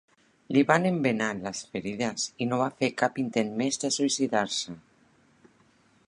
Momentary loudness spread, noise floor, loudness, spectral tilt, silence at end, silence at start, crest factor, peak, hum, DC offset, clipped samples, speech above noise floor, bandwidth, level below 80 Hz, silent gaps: 11 LU; -63 dBFS; -27 LUFS; -4 dB/octave; 1.3 s; 0.5 s; 24 dB; -4 dBFS; none; under 0.1%; under 0.1%; 36 dB; 11 kHz; -68 dBFS; none